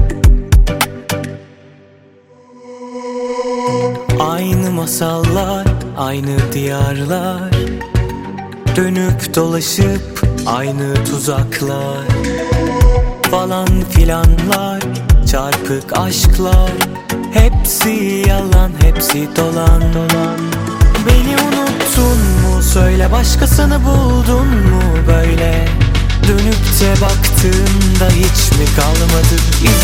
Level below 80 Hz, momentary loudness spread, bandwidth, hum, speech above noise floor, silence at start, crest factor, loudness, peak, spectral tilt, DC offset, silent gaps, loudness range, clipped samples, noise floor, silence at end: -14 dBFS; 7 LU; 17 kHz; none; 33 dB; 0 s; 12 dB; -13 LUFS; 0 dBFS; -5 dB/octave; under 0.1%; none; 5 LU; 0.2%; -44 dBFS; 0 s